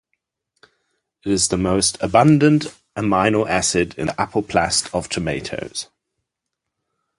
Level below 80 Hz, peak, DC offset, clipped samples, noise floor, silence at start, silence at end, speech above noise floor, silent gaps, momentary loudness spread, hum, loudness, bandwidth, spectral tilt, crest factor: -44 dBFS; -2 dBFS; under 0.1%; under 0.1%; -81 dBFS; 1.25 s; 1.35 s; 62 dB; none; 13 LU; none; -19 LUFS; 11.5 kHz; -4.5 dB/octave; 20 dB